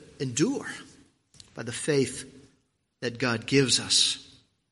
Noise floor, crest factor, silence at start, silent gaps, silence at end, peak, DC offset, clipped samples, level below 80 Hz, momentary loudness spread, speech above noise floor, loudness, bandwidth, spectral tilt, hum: -71 dBFS; 20 dB; 0 s; none; 0.45 s; -8 dBFS; under 0.1%; under 0.1%; -64 dBFS; 18 LU; 44 dB; -26 LUFS; 11.5 kHz; -3 dB/octave; none